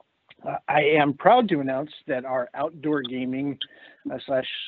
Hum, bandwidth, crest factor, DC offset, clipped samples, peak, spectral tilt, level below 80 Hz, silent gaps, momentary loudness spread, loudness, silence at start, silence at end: none; 4.6 kHz; 22 dB; under 0.1%; under 0.1%; -2 dBFS; -3.5 dB/octave; -70 dBFS; none; 16 LU; -24 LUFS; 0.45 s; 0 s